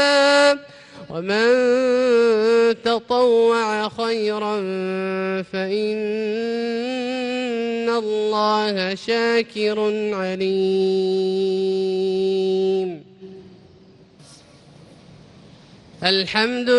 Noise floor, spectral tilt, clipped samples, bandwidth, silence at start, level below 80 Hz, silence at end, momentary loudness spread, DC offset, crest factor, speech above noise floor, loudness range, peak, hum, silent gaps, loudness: -49 dBFS; -4.5 dB/octave; under 0.1%; 10.5 kHz; 0 s; -64 dBFS; 0 s; 8 LU; under 0.1%; 16 dB; 29 dB; 8 LU; -4 dBFS; none; none; -20 LUFS